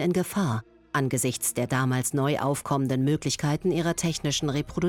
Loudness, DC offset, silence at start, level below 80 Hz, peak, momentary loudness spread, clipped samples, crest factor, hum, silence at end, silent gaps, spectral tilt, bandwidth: -26 LUFS; under 0.1%; 0 s; -54 dBFS; -12 dBFS; 3 LU; under 0.1%; 14 dB; none; 0 s; none; -5 dB/octave; 18 kHz